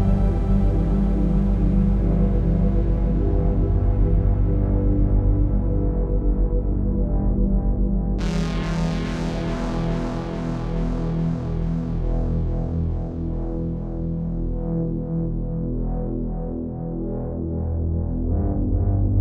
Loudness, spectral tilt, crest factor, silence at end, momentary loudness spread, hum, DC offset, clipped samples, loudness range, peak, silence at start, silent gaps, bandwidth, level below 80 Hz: -24 LUFS; -9 dB/octave; 12 dB; 0 s; 7 LU; none; under 0.1%; under 0.1%; 6 LU; -8 dBFS; 0 s; none; 6.8 kHz; -24 dBFS